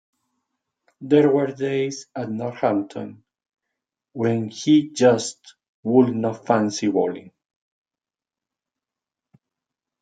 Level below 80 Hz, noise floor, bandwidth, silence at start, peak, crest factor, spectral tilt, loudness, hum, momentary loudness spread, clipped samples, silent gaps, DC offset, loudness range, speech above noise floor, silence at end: -70 dBFS; under -90 dBFS; 9.2 kHz; 1 s; -2 dBFS; 20 dB; -6 dB/octave; -21 LUFS; none; 15 LU; under 0.1%; 5.68-5.83 s; under 0.1%; 6 LU; over 70 dB; 2.8 s